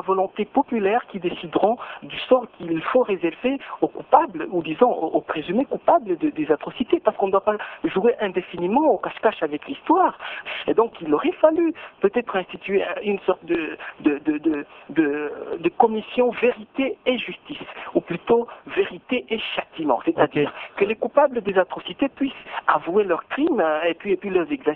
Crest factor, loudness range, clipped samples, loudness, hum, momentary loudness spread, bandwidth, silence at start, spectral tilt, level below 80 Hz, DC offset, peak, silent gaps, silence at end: 20 dB; 2 LU; under 0.1%; -22 LUFS; none; 8 LU; 4.2 kHz; 0 s; -9 dB/octave; -60 dBFS; under 0.1%; -2 dBFS; none; 0 s